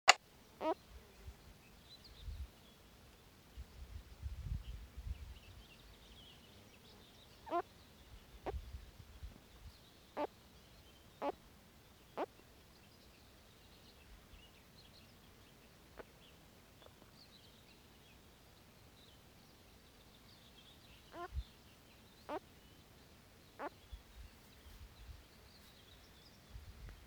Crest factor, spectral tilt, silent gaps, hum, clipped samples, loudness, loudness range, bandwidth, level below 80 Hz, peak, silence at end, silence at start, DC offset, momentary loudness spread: 44 dB; -2.5 dB/octave; none; none; under 0.1%; -48 LUFS; 12 LU; over 20 kHz; -58 dBFS; -4 dBFS; 0 s; 0.05 s; under 0.1%; 17 LU